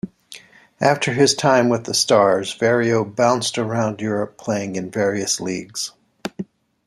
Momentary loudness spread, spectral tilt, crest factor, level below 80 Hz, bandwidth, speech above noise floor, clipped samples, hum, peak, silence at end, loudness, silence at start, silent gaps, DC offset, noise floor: 16 LU; -4 dB/octave; 18 dB; -62 dBFS; 15 kHz; 25 dB; under 0.1%; none; -2 dBFS; 0.45 s; -19 LUFS; 0.05 s; none; under 0.1%; -44 dBFS